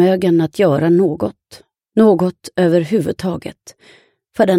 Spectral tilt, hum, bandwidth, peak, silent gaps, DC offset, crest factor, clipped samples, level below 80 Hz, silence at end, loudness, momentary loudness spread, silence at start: -7.5 dB/octave; none; 15.5 kHz; 0 dBFS; none; under 0.1%; 16 dB; under 0.1%; -54 dBFS; 0 s; -15 LUFS; 11 LU; 0 s